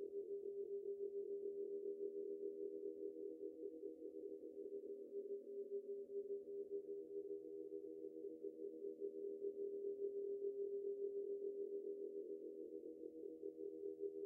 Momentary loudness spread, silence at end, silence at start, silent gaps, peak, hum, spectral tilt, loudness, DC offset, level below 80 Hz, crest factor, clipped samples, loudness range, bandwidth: 6 LU; 0 s; 0 s; none; -36 dBFS; none; -3.5 dB/octave; -50 LUFS; under 0.1%; under -90 dBFS; 14 dB; under 0.1%; 4 LU; 0.8 kHz